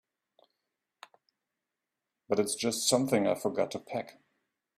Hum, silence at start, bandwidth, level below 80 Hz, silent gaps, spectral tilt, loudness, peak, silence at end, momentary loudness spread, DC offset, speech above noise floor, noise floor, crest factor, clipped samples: none; 2.3 s; 16 kHz; -76 dBFS; none; -3.5 dB/octave; -30 LUFS; -12 dBFS; 0.7 s; 12 LU; under 0.1%; 58 dB; -88 dBFS; 22 dB; under 0.1%